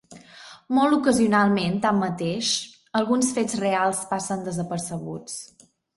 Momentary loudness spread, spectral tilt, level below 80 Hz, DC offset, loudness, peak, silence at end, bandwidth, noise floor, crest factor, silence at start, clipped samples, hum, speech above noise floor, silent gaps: 14 LU; -4.5 dB/octave; -60 dBFS; under 0.1%; -23 LUFS; -6 dBFS; 0.5 s; 11.5 kHz; -47 dBFS; 18 dB; 0.1 s; under 0.1%; none; 24 dB; none